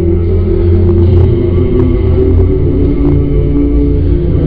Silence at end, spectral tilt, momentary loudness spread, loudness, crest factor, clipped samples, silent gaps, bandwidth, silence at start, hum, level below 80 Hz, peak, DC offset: 0 s; -12.5 dB/octave; 3 LU; -10 LUFS; 8 dB; 0.4%; none; 4 kHz; 0 s; none; -14 dBFS; 0 dBFS; 2%